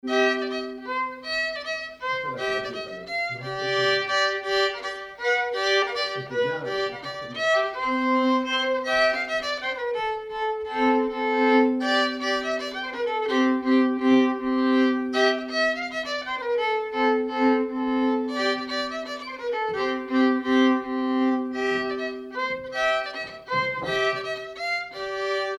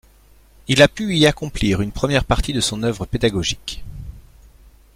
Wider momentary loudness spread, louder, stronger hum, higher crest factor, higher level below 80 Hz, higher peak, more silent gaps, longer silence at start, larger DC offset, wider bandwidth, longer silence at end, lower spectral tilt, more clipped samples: second, 9 LU vs 20 LU; second, -24 LUFS vs -18 LUFS; neither; about the same, 18 dB vs 20 dB; second, -60 dBFS vs -32 dBFS; second, -8 dBFS vs 0 dBFS; neither; second, 0.05 s vs 0.7 s; neither; second, 10.5 kHz vs 16 kHz; second, 0 s vs 0.75 s; about the same, -4 dB/octave vs -4.5 dB/octave; neither